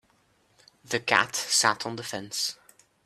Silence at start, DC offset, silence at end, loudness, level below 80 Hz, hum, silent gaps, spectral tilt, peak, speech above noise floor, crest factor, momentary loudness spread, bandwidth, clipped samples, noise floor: 0.9 s; under 0.1%; 0.5 s; -26 LUFS; -72 dBFS; none; none; -1 dB/octave; -4 dBFS; 39 dB; 26 dB; 11 LU; 15.5 kHz; under 0.1%; -66 dBFS